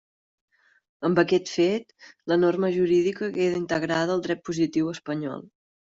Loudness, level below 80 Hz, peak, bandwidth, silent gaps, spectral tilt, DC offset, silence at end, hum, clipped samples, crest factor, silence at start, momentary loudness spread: -25 LUFS; -64 dBFS; -6 dBFS; 7.8 kHz; none; -6 dB/octave; under 0.1%; 0.45 s; none; under 0.1%; 18 dB; 1 s; 9 LU